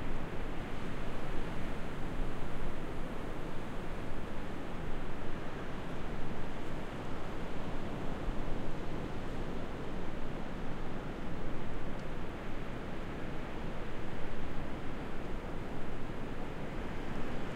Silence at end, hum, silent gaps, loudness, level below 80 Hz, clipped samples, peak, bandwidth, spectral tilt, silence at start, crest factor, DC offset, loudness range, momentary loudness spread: 0 s; none; none; -42 LUFS; -40 dBFS; under 0.1%; -20 dBFS; 6.8 kHz; -6.5 dB/octave; 0 s; 12 dB; under 0.1%; 1 LU; 2 LU